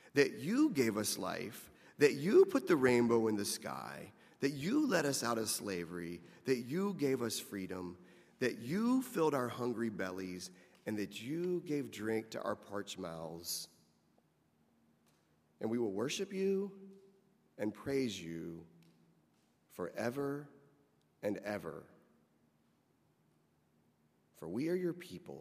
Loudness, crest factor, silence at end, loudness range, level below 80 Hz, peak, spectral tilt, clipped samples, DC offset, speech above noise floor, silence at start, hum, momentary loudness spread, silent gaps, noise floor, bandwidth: -37 LUFS; 24 dB; 0 s; 13 LU; -78 dBFS; -14 dBFS; -4.5 dB/octave; under 0.1%; under 0.1%; 38 dB; 0.05 s; none; 16 LU; none; -74 dBFS; 15.5 kHz